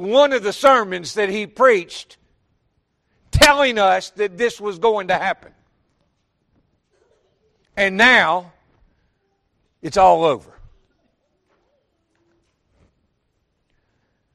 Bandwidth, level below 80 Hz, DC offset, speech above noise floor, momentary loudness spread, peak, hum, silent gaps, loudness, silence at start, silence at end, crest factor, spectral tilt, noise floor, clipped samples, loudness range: 13 kHz; -42 dBFS; under 0.1%; 53 dB; 13 LU; 0 dBFS; none; none; -16 LUFS; 0 s; 3.95 s; 20 dB; -3.5 dB/octave; -69 dBFS; under 0.1%; 7 LU